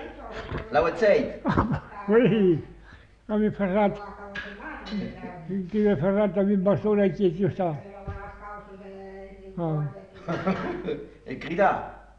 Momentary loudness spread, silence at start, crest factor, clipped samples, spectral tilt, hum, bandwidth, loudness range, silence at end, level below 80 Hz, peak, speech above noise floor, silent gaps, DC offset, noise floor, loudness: 18 LU; 0 s; 18 dB; under 0.1%; -8.5 dB/octave; none; 7.2 kHz; 8 LU; 0.15 s; -48 dBFS; -8 dBFS; 26 dB; none; under 0.1%; -50 dBFS; -25 LUFS